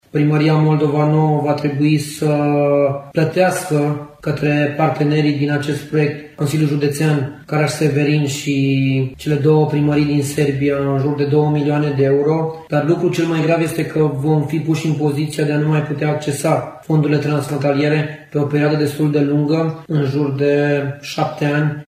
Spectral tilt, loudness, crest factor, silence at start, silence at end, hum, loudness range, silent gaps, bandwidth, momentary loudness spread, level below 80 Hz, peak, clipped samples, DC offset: -7 dB/octave; -17 LUFS; 14 dB; 0.15 s; 0.05 s; none; 2 LU; none; 15 kHz; 5 LU; -52 dBFS; -2 dBFS; under 0.1%; under 0.1%